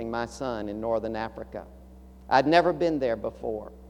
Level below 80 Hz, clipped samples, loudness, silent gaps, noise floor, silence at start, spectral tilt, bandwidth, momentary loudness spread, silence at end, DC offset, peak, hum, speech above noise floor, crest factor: -50 dBFS; under 0.1%; -27 LUFS; none; -47 dBFS; 0 s; -6 dB/octave; 12 kHz; 14 LU; 0 s; under 0.1%; -6 dBFS; none; 20 dB; 22 dB